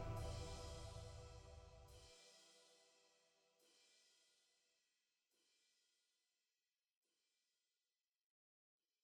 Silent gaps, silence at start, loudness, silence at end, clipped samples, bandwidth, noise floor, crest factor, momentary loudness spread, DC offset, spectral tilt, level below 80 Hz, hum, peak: none; 0 s; -56 LUFS; 4.8 s; under 0.1%; 16 kHz; under -90 dBFS; 22 dB; 16 LU; under 0.1%; -5 dB/octave; -64 dBFS; none; -38 dBFS